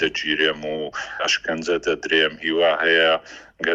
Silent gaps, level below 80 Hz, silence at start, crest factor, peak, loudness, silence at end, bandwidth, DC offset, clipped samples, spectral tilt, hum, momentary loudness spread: none; -56 dBFS; 0 s; 16 dB; -4 dBFS; -20 LUFS; 0 s; 8.6 kHz; under 0.1%; under 0.1%; -2.5 dB/octave; none; 11 LU